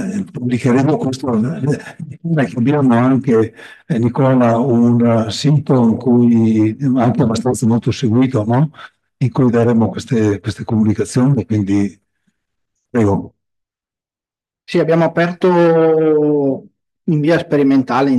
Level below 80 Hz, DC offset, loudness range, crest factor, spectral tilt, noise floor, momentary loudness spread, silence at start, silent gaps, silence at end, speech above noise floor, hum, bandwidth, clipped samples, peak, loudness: -56 dBFS; under 0.1%; 6 LU; 12 dB; -7.5 dB/octave; under -90 dBFS; 8 LU; 0 s; none; 0 s; over 76 dB; none; 12 kHz; under 0.1%; -4 dBFS; -15 LUFS